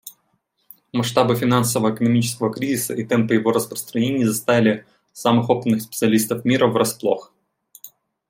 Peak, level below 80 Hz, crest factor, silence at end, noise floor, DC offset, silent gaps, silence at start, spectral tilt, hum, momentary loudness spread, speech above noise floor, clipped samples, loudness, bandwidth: -2 dBFS; -62 dBFS; 18 dB; 0.4 s; -68 dBFS; under 0.1%; none; 0.05 s; -5 dB/octave; none; 6 LU; 49 dB; under 0.1%; -20 LUFS; 16.5 kHz